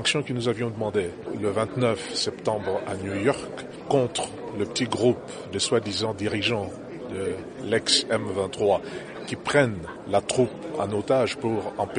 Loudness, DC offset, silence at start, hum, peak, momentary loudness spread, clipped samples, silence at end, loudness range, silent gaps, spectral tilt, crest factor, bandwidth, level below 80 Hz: -26 LUFS; under 0.1%; 0 s; none; -6 dBFS; 10 LU; under 0.1%; 0 s; 2 LU; none; -4 dB/octave; 20 dB; 10.5 kHz; -58 dBFS